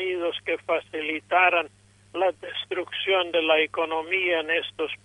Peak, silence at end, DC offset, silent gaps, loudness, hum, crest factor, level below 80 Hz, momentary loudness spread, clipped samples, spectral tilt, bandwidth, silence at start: -8 dBFS; 0.1 s; under 0.1%; none; -24 LUFS; 50 Hz at -60 dBFS; 18 dB; -68 dBFS; 10 LU; under 0.1%; -4 dB/octave; 11 kHz; 0 s